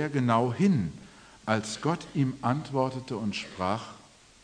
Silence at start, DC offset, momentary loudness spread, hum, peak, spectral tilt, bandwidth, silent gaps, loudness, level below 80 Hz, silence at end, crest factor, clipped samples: 0 s; under 0.1%; 10 LU; none; -8 dBFS; -6.5 dB/octave; 10.5 kHz; none; -29 LUFS; -62 dBFS; 0.45 s; 20 dB; under 0.1%